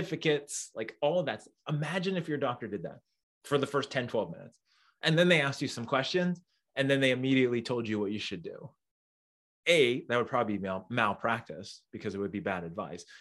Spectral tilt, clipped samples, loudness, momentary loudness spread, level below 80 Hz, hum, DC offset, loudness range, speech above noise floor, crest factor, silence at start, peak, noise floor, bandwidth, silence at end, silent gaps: -5 dB/octave; under 0.1%; -31 LUFS; 15 LU; -74 dBFS; none; under 0.1%; 5 LU; over 59 dB; 22 dB; 0 s; -10 dBFS; under -90 dBFS; 12.5 kHz; 0.05 s; 3.23-3.41 s, 8.91-9.63 s